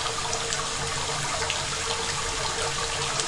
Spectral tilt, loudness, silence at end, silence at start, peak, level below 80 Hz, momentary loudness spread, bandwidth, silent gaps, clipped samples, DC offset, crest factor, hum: -1.5 dB/octave; -26 LUFS; 0 s; 0 s; -10 dBFS; -44 dBFS; 1 LU; 11.5 kHz; none; under 0.1%; under 0.1%; 20 dB; none